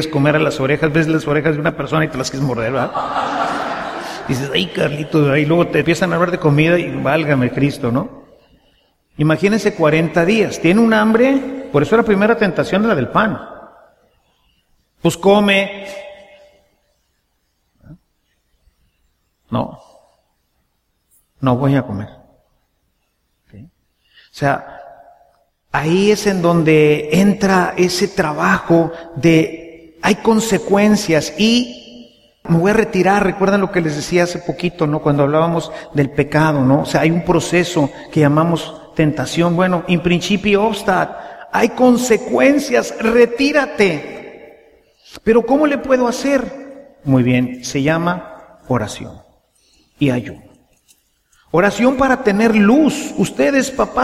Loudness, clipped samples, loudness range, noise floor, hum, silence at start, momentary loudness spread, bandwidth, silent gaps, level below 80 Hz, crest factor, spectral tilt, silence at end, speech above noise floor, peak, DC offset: -15 LUFS; under 0.1%; 9 LU; -66 dBFS; none; 0 s; 10 LU; 15 kHz; none; -44 dBFS; 16 dB; -6 dB/octave; 0 s; 51 dB; 0 dBFS; under 0.1%